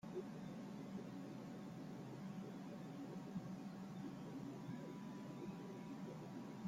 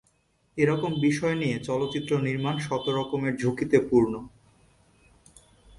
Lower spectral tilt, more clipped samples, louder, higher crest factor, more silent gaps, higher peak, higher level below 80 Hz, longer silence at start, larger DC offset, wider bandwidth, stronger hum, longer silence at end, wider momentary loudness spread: about the same, -7 dB/octave vs -6.5 dB/octave; neither; second, -52 LUFS vs -26 LUFS; second, 14 dB vs 20 dB; neither; second, -38 dBFS vs -6 dBFS; second, -80 dBFS vs -58 dBFS; second, 0.05 s vs 0.55 s; neither; first, 16 kHz vs 11.5 kHz; neither; second, 0 s vs 1.5 s; second, 2 LU vs 5 LU